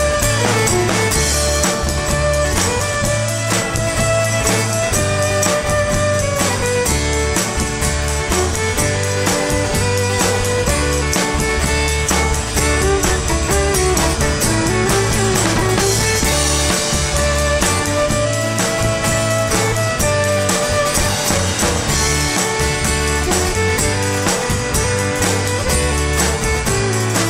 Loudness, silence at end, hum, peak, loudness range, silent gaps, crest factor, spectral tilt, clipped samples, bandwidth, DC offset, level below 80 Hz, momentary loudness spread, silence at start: -16 LUFS; 0 s; none; -2 dBFS; 2 LU; none; 16 dB; -3.5 dB/octave; under 0.1%; 16.5 kHz; under 0.1%; -24 dBFS; 2 LU; 0 s